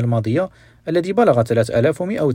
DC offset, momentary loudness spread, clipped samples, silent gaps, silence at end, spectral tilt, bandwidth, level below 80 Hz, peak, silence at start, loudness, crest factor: under 0.1%; 7 LU; under 0.1%; none; 0 s; -7.5 dB/octave; 15.5 kHz; -50 dBFS; -2 dBFS; 0 s; -18 LUFS; 16 dB